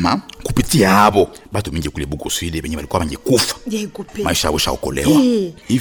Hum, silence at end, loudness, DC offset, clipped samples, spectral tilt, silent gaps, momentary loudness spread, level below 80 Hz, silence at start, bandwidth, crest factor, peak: none; 0 s; -17 LUFS; under 0.1%; under 0.1%; -4.5 dB/octave; none; 12 LU; -34 dBFS; 0 s; over 20 kHz; 16 dB; -2 dBFS